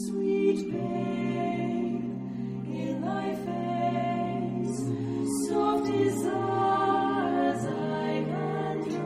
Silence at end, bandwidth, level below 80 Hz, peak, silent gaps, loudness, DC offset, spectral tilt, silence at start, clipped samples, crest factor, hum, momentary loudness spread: 0 s; 14.5 kHz; -62 dBFS; -14 dBFS; none; -29 LUFS; under 0.1%; -6.5 dB/octave; 0 s; under 0.1%; 14 dB; none; 6 LU